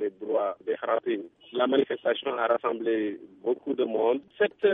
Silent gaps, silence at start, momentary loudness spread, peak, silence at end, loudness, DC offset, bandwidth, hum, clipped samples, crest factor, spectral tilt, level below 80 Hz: none; 0 s; 7 LU; -10 dBFS; 0 s; -28 LUFS; under 0.1%; 3.9 kHz; none; under 0.1%; 18 dB; -7.5 dB/octave; -78 dBFS